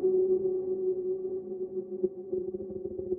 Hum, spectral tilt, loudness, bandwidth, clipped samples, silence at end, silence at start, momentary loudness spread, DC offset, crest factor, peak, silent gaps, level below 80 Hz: none; -14.5 dB/octave; -32 LUFS; 1.2 kHz; under 0.1%; 0 s; 0 s; 10 LU; under 0.1%; 14 dB; -16 dBFS; none; -66 dBFS